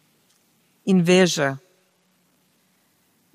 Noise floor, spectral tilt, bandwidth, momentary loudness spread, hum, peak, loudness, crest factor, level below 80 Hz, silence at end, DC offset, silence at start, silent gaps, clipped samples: -64 dBFS; -5 dB/octave; 14.5 kHz; 15 LU; none; -4 dBFS; -19 LUFS; 20 dB; -72 dBFS; 1.8 s; under 0.1%; 0.85 s; none; under 0.1%